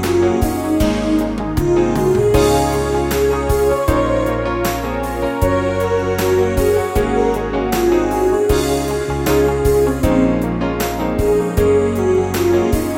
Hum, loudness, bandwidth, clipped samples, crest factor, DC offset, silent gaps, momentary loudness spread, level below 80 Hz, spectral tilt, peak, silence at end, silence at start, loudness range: none; -16 LUFS; 16.5 kHz; under 0.1%; 14 dB; under 0.1%; none; 4 LU; -26 dBFS; -6 dB/octave; -2 dBFS; 0 s; 0 s; 2 LU